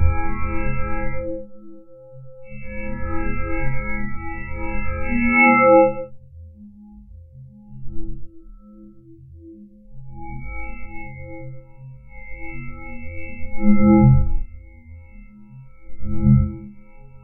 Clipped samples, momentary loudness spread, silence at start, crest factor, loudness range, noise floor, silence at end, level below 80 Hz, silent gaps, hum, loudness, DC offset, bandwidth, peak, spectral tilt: under 0.1%; 29 LU; 0 s; 18 dB; 22 LU; -44 dBFS; 0.05 s; -30 dBFS; none; none; -20 LUFS; under 0.1%; 2.8 kHz; -2 dBFS; -14.5 dB/octave